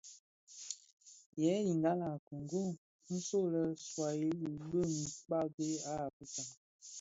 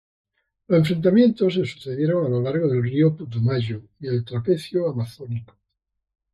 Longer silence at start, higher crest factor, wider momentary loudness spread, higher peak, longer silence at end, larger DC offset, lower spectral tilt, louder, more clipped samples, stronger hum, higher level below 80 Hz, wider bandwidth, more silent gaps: second, 0.05 s vs 0.7 s; about the same, 18 dB vs 16 dB; first, 17 LU vs 13 LU; second, -22 dBFS vs -6 dBFS; second, 0 s vs 0.9 s; neither; second, -7 dB/octave vs -8.5 dB/octave; second, -38 LUFS vs -22 LUFS; neither; neither; second, -72 dBFS vs -60 dBFS; second, 8 kHz vs 12.5 kHz; first, 0.19-0.47 s, 0.93-0.97 s, 1.26-1.33 s, 2.19-2.31 s, 2.78-2.99 s, 5.54-5.58 s, 6.13-6.20 s, 6.57-6.79 s vs none